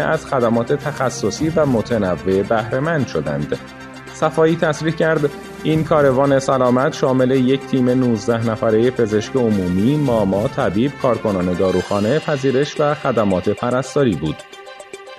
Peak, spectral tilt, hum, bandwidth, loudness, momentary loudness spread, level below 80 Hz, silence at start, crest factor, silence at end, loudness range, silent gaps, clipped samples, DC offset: -2 dBFS; -6.5 dB/octave; none; 13.5 kHz; -18 LUFS; 7 LU; -48 dBFS; 0 s; 16 dB; 0 s; 3 LU; none; under 0.1%; under 0.1%